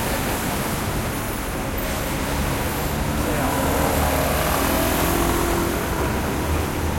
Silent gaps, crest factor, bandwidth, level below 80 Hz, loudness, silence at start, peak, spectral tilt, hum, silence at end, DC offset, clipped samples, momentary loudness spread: none; 16 dB; 16.5 kHz; -30 dBFS; -22 LUFS; 0 s; -6 dBFS; -4.5 dB/octave; none; 0 s; under 0.1%; under 0.1%; 5 LU